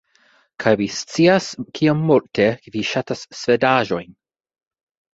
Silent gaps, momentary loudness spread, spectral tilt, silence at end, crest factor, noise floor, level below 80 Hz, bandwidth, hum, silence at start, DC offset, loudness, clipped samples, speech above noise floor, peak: none; 9 LU; -5.5 dB/octave; 1 s; 18 dB; -58 dBFS; -58 dBFS; 8 kHz; none; 0.6 s; under 0.1%; -19 LUFS; under 0.1%; 39 dB; -2 dBFS